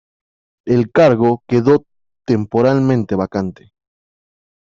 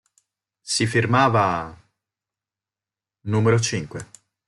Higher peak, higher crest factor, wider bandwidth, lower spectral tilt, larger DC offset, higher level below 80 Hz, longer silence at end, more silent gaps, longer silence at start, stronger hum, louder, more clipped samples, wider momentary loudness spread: about the same, -2 dBFS vs -4 dBFS; second, 14 dB vs 20 dB; second, 7.4 kHz vs 11.5 kHz; first, -8.5 dB/octave vs -5 dB/octave; neither; first, -52 dBFS vs -58 dBFS; first, 1.15 s vs 0.45 s; neither; about the same, 0.65 s vs 0.65 s; neither; first, -15 LUFS vs -21 LUFS; neither; second, 11 LU vs 19 LU